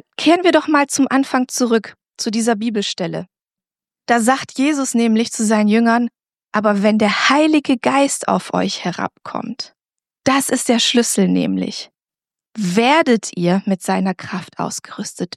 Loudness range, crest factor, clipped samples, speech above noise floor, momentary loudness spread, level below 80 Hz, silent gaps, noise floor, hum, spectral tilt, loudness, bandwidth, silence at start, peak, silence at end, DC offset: 4 LU; 16 dB; under 0.1%; over 74 dB; 13 LU; -68 dBFS; none; under -90 dBFS; none; -4 dB/octave; -17 LUFS; 14 kHz; 0.2 s; -2 dBFS; 0.1 s; under 0.1%